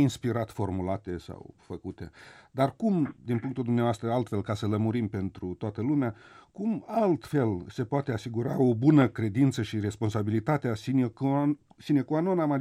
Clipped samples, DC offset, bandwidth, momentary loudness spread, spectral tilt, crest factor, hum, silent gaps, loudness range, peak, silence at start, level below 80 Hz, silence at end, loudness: under 0.1%; under 0.1%; 14 kHz; 11 LU; -8 dB/octave; 18 dB; none; none; 5 LU; -10 dBFS; 0 s; -60 dBFS; 0 s; -28 LUFS